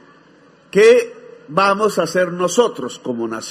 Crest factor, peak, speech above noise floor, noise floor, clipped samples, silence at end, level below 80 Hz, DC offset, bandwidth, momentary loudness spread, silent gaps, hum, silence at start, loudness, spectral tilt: 16 dB; 0 dBFS; 34 dB; -49 dBFS; under 0.1%; 0 s; -64 dBFS; under 0.1%; 14 kHz; 13 LU; none; none; 0.75 s; -16 LUFS; -4 dB/octave